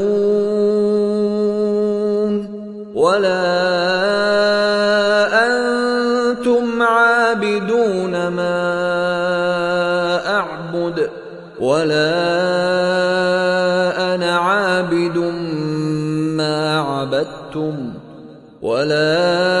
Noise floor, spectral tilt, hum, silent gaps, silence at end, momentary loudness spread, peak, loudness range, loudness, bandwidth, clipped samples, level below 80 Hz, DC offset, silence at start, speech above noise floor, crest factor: -39 dBFS; -5.5 dB/octave; none; none; 0 s; 8 LU; -2 dBFS; 4 LU; -17 LUFS; 11.5 kHz; under 0.1%; -56 dBFS; under 0.1%; 0 s; 23 dB; 16 dB